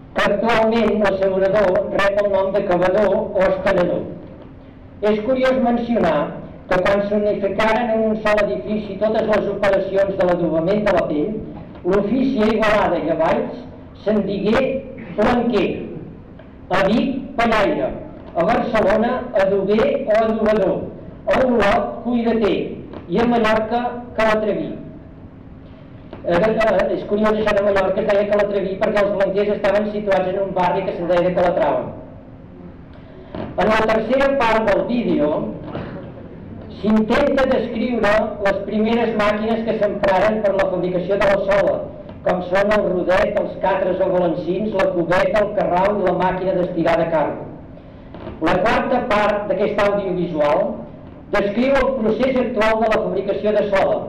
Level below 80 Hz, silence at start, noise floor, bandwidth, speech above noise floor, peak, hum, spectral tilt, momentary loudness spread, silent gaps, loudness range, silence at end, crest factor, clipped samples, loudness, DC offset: -40 dBFS; 0 s; -39 dBFS; 10.5 kHz; 22 dB; -10 dBFS; none; -7 dB/octave; 12 LU; none; 3 LU; 0 s; 8 dB; under 0.1%; -18 LUFS; under 0.1%